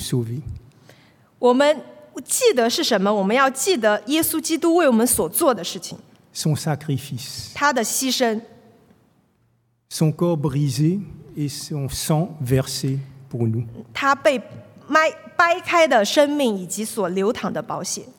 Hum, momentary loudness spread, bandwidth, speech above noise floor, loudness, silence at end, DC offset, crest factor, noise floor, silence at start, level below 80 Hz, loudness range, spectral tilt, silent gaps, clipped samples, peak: none; 13 LU; 18 kHz; 44 dB; -20 LUFS; 0.1 s; under 0.1%; 20 dB; -64 dBFS; 0 s; -54 dBFS; 6 LU; -4.5 dB/octave; none; under 0.1%; -2 dBFS